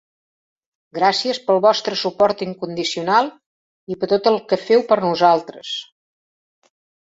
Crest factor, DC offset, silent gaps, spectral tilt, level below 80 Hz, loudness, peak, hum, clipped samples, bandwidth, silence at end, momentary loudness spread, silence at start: 18 dB; under 0.1%; 3.46-3.87 s; -4.5 dB/octave; -64 dBFS; -18 LUFS; -2 dBFS; none; under 0.1%; 8 kHz; 1.2 s; 12 LU; 0.95 s